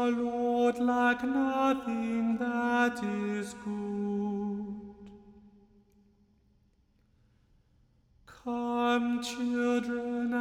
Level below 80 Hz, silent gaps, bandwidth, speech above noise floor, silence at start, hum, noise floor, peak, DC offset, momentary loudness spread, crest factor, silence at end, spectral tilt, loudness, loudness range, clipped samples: -66 dBFS; none; 13 kHz; 38 dB; 0 s; none; -68 dBFS; -16 dBFS; under 0.1%; 10 LU; 16 dB; 0 s; -5.5 dB/octave; -30 LUFS; 14 LU; under 0.1%